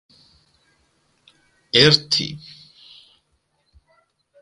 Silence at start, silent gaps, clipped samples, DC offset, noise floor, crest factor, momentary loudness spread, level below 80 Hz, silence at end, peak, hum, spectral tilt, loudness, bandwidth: 1.75 s; none; under 0.1%; under 0.1%; -68 dBFS; 24 dB; 25 LU; -58 dBFS; 2.05 s; 0 dBFS; none; -4 dB/octave; -16 LUFS; 11.5 kHz